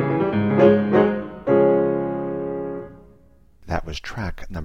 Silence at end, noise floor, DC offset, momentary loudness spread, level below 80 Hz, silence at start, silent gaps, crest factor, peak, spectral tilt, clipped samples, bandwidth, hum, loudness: 0 s; -54 dBFS; under 0.1%; 15 LU; -42 dBFS; 0 s; none; 18 dB; -2 dBFS; -8 dB/octave; under 0.1%; 7.2 kHz; none; -20 LUFS